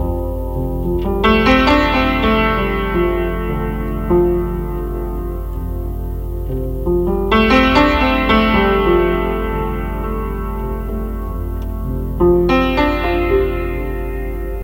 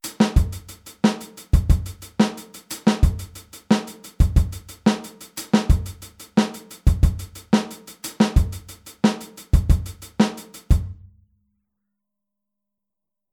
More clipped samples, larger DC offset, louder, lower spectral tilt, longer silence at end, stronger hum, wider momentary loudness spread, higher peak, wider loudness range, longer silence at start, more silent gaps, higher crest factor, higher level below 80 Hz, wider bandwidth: neither; neither; first, -17 LUFS vs -22 LUFS; about the same, -7 dB/octave vs -6 dB/octave; second, 0 s vs 2.4 s; neither; second, 12 LU vs 16 LU; about the same, 0 dBFS vs -2 dBFS; first, 6 LU vs 3 LU; about the same, 0 s vs 0.05 s; neither; about the same, 16 dB vs 18 dB; about the same, -22 dBFS vs -26 dBFS; second, 16 kHz vs 19 kHz